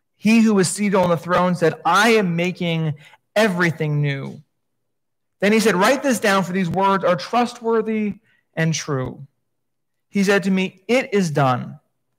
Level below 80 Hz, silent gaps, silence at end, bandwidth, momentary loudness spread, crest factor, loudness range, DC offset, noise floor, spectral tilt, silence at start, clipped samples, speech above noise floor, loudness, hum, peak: -60 dBFS; none; 0.4 s; 16 kHz; 10 LU; 16 dB; 5 LU; under 0.1%; -81 dBFS; -5.5 dB/octave; 0.25 s; under 0.1%; 62 dB; -19 LUFS; none; -4 dBFS